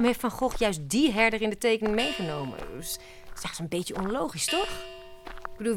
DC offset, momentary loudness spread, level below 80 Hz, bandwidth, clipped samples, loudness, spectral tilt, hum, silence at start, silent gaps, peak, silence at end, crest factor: under 0.1%; 17 LU; -46 dBFS; 17.5 kHz; under 0.1%; -28 LUFS; -3.5 dB/octave; none; 0 s; none; -10 dBFS; 0 s; 20 dB